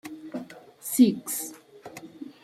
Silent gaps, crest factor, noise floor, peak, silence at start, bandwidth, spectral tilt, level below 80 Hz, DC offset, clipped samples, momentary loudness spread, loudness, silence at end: none; 22 dB; -46 dBFS; -8 dBFS; 0.05 s; 16 kHz; -4.5 dB/octave; -74 dBFS; under 0.1%; under 0.1%; 24 LU; -24 LUFS; 0.1 s